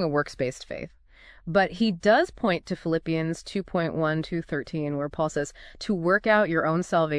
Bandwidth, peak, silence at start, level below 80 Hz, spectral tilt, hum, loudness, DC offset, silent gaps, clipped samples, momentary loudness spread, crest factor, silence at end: 11 kHz; -8 dBFS; 0 s; -52 dBFS; -6 dB/octave; none; -26 LUFS; under 0.1%; none; under 0.1%; 12 LU; 18 dB; 0 s